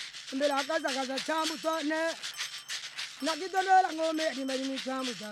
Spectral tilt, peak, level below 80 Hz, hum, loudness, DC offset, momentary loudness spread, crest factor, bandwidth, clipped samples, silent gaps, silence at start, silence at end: -1.5 dB/octave; -14 dBFS; -82 dBFS; none; -31 LUFS; under 0.1%; 11 LU; 18 dB; 16 kHz; under 0.1%; none; 0 s; 0 s